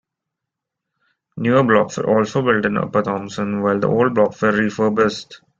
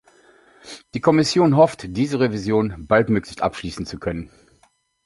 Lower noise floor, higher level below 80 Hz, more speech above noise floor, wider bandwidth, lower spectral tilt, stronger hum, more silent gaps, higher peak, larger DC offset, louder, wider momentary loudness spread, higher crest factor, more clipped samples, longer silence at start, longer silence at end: first, -82 dBFS vs -61 dBFS; second, -56 dBFS vs -46 dBFS; first, 65 dB vs 42 dB; second, 7.6 kHz vs 11.5 kHz; about the same, -6.5 dB/octave vs -6 dB/octave; neither; neither; about the same, -2 dBFS vs -2 dBFS; neither; about the same, -18 LUFS vs -20 LUFS; second, 8 LU vs 14 LU; about the same, 16 dB vs 20 dB; neither; first, 1.35 s vs 0.65 s; second, 0.25 s vs 0.8 s